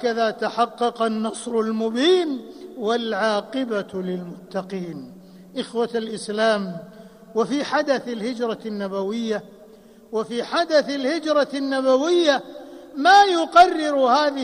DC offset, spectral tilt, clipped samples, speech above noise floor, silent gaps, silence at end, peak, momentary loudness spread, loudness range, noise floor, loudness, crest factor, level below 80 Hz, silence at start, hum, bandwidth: under 0.1%; -4.5 dB/octave; under 0.1%; 26 dB; none; 0 s; -2 dBFS; 16 LU; 9 LU; -47 dBFS; -21 LUFS; 20 dB; -64 dBFS; 0 s; none; 15 kHz